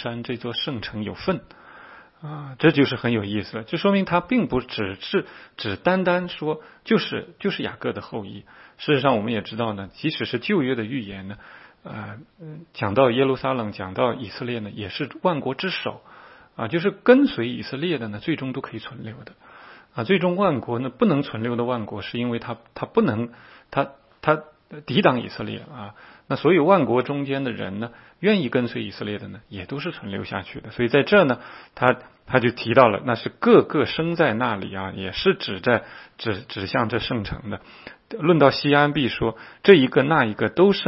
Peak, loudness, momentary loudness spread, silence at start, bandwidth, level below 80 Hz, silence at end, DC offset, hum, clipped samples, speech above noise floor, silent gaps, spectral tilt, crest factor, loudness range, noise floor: 0 dBFS; -22 LUFS; 18 LU; 0 s; 5.8 kHz; -54 dBFS; 0 s; under 0.1%; none; under 0.1%; 24 dB; none; -9.5 dB/octave; 22 dB; 6 LU; -46 dBFS